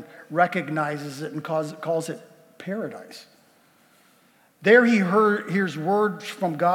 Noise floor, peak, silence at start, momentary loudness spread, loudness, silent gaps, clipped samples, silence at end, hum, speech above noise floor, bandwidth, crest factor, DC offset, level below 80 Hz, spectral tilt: -60 dBFS; -4 dBFS; 0 s; 18 LU; -23 LUFS; none; under 0.1%; 0 s; none; 37 dB; 17.5 kHz; 20 dB; under 0.1%; -88 dBFS; -6 dB/octave